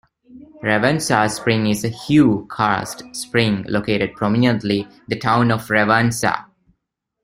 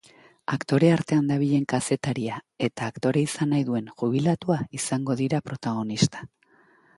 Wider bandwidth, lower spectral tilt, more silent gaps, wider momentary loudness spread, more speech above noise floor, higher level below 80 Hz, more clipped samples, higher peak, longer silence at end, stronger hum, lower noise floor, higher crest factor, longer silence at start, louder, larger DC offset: first, 16 kHz vs 11.5 kHz; about the same, -5 dB/octave vs -6 dB/octave; neither; about the same, 8 LU vs 9 LU; first, 58 dB vs 35 dB; first, -50 dBFS vs -60 dBFS; neither; first, 0 dBFS vs -6 dBFS; about the same, 0.8 s vs 0.7 s; neither; first, -76 dBFS vs -60 dBFS; about the same, 18 dB vs 20 dB; second, 0.3 s vs 0.5 s; first, -18 LUFS vs -25 LUFS; neither